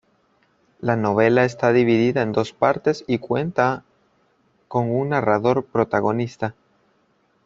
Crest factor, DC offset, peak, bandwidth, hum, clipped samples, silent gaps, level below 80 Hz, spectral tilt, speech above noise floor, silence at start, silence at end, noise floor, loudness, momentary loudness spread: 18 dB; under 0.1%; -2 dBFS; 7.6 kHz; none; under 0.1%; none; -60 dBFS; -7.5 dB/octave; 44 dB; 0.8 s; 0.95 s; -64 dBFS; -20 LUFS; 9 LU